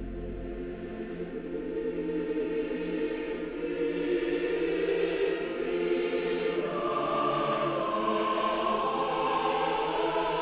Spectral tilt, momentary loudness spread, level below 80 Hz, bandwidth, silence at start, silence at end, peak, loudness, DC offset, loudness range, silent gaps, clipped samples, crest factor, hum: -3.5 dB/octave; 9 LU; -50 dBFS; 4 kHz; 0 s; 0 s; -16 dBFS; -30 LUFS; under 0.1%; 5 LU; none; under 0.1%; 14 dB; none